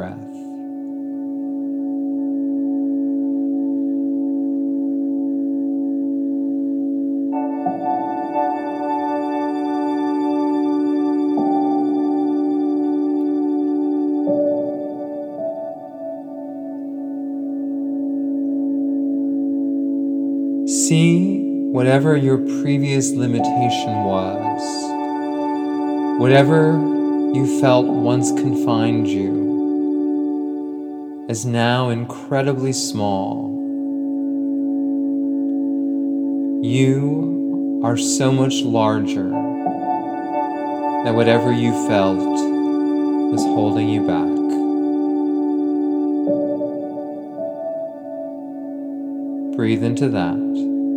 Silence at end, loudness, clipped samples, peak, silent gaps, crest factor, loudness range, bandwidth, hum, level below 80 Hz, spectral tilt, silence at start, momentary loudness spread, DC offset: 0 s; -20 LUFS; under 0.1%; 0 dBFS; none; 20 dB; 6 LU; 11.5 kHz; none; -68 dBFS; -6 dB/octave; 0 s; 11 LU; under 0.1%